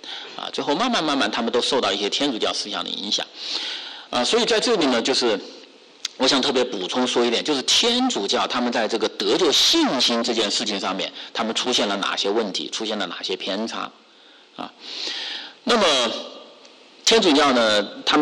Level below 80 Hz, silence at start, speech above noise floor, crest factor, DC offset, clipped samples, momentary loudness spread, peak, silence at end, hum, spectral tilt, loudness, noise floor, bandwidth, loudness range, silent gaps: -62 dBFS; 0.05 s; 29 dB; 14 dB; under 0.1%; under 0.1%; 13 LU; -8 dBFS; 0 s; none; -2 dB/octave; -20 LUFS; -50 dBFS; 12 kHz; 6 LU; none